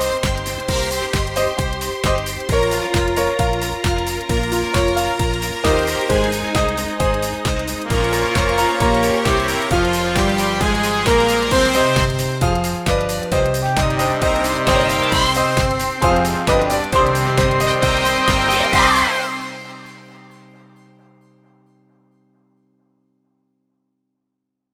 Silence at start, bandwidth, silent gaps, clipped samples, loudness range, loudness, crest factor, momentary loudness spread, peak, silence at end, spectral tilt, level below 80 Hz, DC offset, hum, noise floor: 0 s; 19 kHz; none; under 0.1%; 3 LU; -18 LUFS; 18 dB; 6 LU; -2 dBFS; 4.5 s; -4.5 dB/octave; -28 dBFS; under 0.1%; none; -78 dBFS